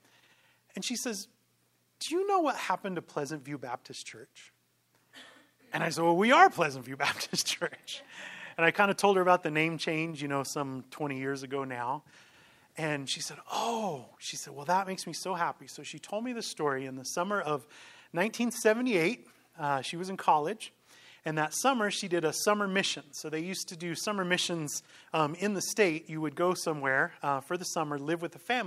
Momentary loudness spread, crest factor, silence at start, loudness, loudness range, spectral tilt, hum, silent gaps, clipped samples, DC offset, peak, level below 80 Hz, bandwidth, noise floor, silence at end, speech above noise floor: 14 LU; 26 dB; 0.75 s; -31 LUFS; 7 LU; -3.5 dB/octave; none; none; under 0.1%; under 0.1%; -6 dBFS; -82 dBFS; 16 kHz; -72 dBFS; 0 s; 41 dB